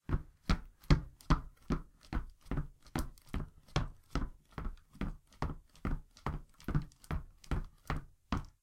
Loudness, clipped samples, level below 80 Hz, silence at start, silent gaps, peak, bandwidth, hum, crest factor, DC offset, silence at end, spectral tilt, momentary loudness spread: -41 LUFS; under 0.1%; -40 dBFS; 0.1 s; none; -12 dBFS; 16 kHz; none; 26 dB; under 0.1%; 0.15 s; -6.5 dB/octave; 9 LU